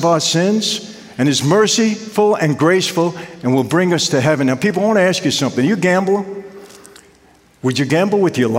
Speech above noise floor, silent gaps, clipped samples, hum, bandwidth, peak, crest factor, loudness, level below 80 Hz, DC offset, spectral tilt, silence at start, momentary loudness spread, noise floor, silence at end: 35 dB; none; under 0.1%; none; 16 kHz; -2 dBFS; 14 dB; -15 LUFS; -60 dBFS; under 0.1%; -4.5 dB/octave; 0 s; 7 LU; -50 dBFS; 0 s